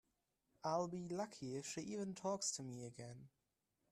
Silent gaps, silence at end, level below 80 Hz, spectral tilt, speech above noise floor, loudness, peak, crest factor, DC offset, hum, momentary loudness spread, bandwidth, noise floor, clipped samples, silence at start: none; 0.65 s; -82 dBFS; -4 dB/octave; 42 dB; -45 LUFS; -28 dBFS; 18 dB; under 0.1%; none; 12 LU; 14 kHz; -88 dBFS; under 0.1%; 0.65 s